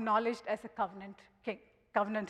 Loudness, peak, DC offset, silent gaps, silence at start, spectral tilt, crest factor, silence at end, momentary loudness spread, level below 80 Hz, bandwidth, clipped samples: -37 LUFS; -16 dBFS; under 0.1%; none; 0 s; -6 dB/octave; 20 dB; 0 s; 16 LU; -74 dBFS; 12 kHz; under 0.1%